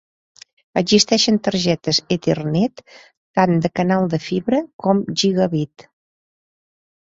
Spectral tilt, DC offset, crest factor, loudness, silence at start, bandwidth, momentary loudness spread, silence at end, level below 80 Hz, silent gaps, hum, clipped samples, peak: -5 dB/octave; under 0.1%; 18 dB; -18 LUFS; 0.75 s; 8 kHz; 8 LU; 1.35 s; -56 dBFS; 3.17-3.34 s, 4.73-4.79 s; none; under 0.1%; -2 dBFS